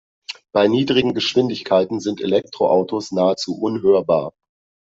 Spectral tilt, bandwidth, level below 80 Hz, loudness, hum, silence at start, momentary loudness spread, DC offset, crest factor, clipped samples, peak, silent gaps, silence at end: -5.5 dB/octave; 7.8 kHz; -58 dBFS; -19 LUFS; none; 0.3 s; 7 LU; under 0.1%; 16 dB; under 0.1%; -4 dBFS; none; 0.6 s